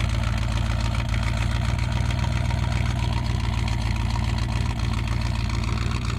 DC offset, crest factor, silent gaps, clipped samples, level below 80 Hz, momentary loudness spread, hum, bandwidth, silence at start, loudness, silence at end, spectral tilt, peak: under 0.1%; 12 dB; none; under 0.1%; -28 dBFS; 1 LU; none; 12 kHz; 0 s; -25 LUFS; 0 s; -5.5 dB/octave; -12 dBFS